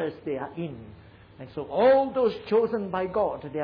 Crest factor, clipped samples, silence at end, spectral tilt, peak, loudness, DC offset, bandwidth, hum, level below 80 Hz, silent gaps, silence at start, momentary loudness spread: 14 dB; under 0.1%; 0 s; -9 dB/octave; -12 dBFS; -25 LUFS; under 0.1%; 5.2 kHz; none; -58 dBFS; none; 0 s; 18 LU